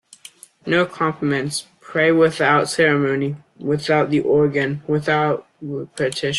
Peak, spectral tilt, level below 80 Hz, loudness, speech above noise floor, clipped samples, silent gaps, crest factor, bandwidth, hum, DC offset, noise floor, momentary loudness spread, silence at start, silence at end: -4 dBFS; -5.5 dB/octave; -58 dBFS; -19 LUFS; 26 dB; under 0.1%; none; 16 dB; 12.5 kHz; none; under 0.1%; -45 dBFS; 12 LU; 0.65 s; 0 s